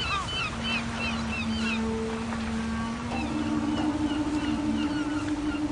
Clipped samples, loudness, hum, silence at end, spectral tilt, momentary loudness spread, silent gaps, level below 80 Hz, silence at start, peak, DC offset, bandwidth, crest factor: under 0.1%; -29 LUFS; none; 0 s; -5 dB/octave; 3 LU; none; -42 dBFS; 0 s; -16 dBFS; under 0.1%; 10.5 kHz; 12 dB